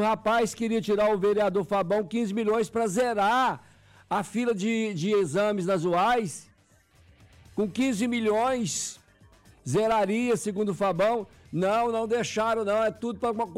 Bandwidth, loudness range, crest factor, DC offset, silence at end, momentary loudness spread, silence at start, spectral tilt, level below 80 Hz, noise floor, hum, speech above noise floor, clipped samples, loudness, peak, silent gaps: 16 kHz; 3 LU; 8 dB; under 0.1%; 0 s; 7 LU; 0 s; -5 dB/octave; -60 dBFS; -61 dBFS; none; 35 dB; under 0.1%; -26 LUFS; -18 dBFS; none